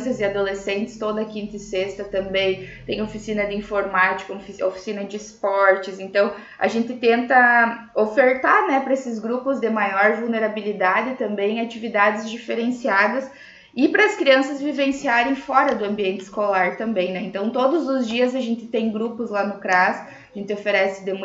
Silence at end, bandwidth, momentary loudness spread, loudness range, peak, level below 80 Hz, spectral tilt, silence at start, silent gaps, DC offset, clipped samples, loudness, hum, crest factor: 0 s; 8 kHz; 10 LU; 5 LU; -2 dBFS; -56 dBFS; -5 dB/octave; 0 s; none; under 0.1%; under 0.1%; -21 LUFS; none; 20 dB